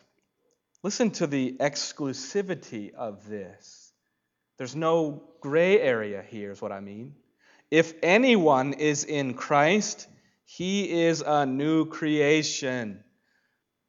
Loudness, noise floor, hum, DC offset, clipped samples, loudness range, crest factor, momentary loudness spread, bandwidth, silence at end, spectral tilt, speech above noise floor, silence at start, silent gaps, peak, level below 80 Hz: -25 LUFS; -79 dBFS; none; under 0.1%; under 0.1%; 8 LU; 22 dB; 17 LU; 7.8 kHz; 0.9 s; -4.5 dB/octave; 54 dB; 0.85 s; none; -6 dBFS; -78 dBFS